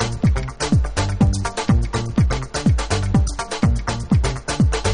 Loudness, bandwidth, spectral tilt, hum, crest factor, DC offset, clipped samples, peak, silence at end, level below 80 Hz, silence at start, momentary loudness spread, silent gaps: -20 LUFS; 10.5 kHz; -5.5 dB/octave; none; 14 dB; under 0.1%; under 0.1%; -4 dBFS; 0 s; -24 dBFS; 0 s; 4 LU; none